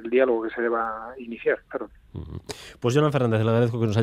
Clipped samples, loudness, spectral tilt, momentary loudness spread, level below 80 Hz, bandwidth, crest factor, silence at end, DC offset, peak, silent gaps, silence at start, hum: under 0.1%; -24 LUFS; -7 dB/octave; 16 LU; -54 dBFS; 13.5 kHz; 18 dB; 0 s; under 0.1%; -6 dBFS; none; 0 s; none